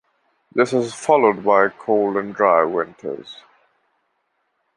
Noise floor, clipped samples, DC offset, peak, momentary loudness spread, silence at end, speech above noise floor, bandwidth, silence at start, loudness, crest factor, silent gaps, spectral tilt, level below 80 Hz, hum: -70 dBFS; under 0.1%; under 0.1%; -2 dBFS; 15 LU; 1.45 s; 52 dB; 11 kHz; 0.55 s; -18 LUFS; 18 dB; none; -5.5 dB/octave; -66 dBFS; none